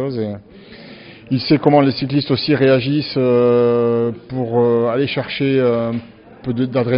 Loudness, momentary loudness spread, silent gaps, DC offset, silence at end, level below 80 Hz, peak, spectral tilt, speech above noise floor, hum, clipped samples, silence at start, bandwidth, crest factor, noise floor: -16 LUFS; 11 LU; none; under 0.1%; 0 s; -52 dBFS; 0 dBFS; -5.5 dB/octave; 22 dB; none; under 0.1%; 0 s; 5.4 kHz; 16 dB; -38 dBFS